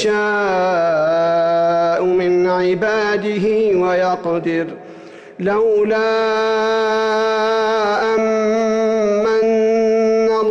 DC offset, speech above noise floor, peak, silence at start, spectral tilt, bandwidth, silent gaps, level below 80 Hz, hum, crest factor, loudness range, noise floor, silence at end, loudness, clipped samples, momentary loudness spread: under 0.1%; 21 dB; -8 dBFS; 0 s; -5.5 dB/octave; 8 kHz; none; -56 dBFS; none; 8 dB; 2 LU; -37 dBFS; 0 s; -16 LUFS; under 0.1%; 3 LU